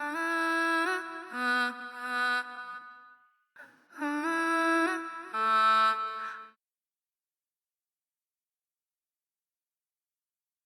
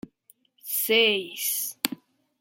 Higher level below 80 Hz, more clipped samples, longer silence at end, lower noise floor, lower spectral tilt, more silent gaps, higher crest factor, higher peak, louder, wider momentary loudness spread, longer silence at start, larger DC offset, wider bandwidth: second, under -90 dBFS vs -76 dBFS; neither; first, 4.15 s vs 0.45 s; first, under -90 dBFS vs -62 dBFS; about the same, -1.5 dB/octave vs -0.5 dB/octave; neither; second, 16 dB vs 28 dB; second, -18 dBFS vs 0 dBFS; second, -29 LUFS vs -24 LUFS; about the same, 15 LU vs 15 LU; second, 0 s vs 0.65 s; neither; first, over 20 kHz vs 17 kHz